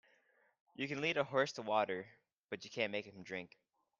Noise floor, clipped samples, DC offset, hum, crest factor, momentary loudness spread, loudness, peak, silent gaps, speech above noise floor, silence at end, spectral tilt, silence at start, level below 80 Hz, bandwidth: -74 dBFS; under 0.1%; under 0.1%; none; 22 dB; 15 LU; -39 LUFS; -20 dBFS; 2.33-2.48 s; 35 dB; 0.55 s; -4.5 dB/octave; 0.8 s; -84 dBFS; 7.6 kHz